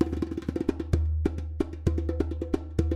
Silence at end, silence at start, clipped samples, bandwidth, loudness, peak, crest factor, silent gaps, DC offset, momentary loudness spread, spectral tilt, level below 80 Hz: 0 s; 0 s; under 0.1%; 8.4 kHz; -30 LUFS; -10 dBFS; 18 dB; none; under 0.1%; 4 LU; -9 dB/octave; -32 dBFS